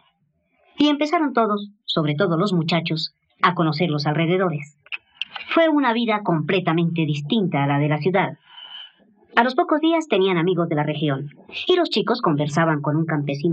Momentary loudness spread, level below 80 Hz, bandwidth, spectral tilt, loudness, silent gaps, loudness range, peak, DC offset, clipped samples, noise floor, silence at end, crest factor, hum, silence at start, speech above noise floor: 11 LU; -70 dBFS; 8.4 kHz; -7 dB/octave; -21 LUFS; none; 1 LU; -4 dBFS; under 0.1%; under 0.1%; -67 dBFS; 0 s; 18 dB; none; 0.8 s; 47 dB